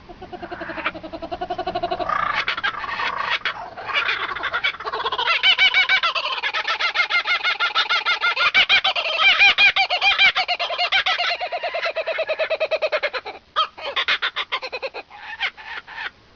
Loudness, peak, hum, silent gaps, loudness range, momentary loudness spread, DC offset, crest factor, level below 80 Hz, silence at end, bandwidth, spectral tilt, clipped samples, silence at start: -19 LUFS; -6 dBFS; none; none; 9 LU; 17 LU; under 0.1%; 16 dB; -54 dBFS; 0.25 s; 7.2 kHz; 3 dB/octave; under 0.1%; 0.05 s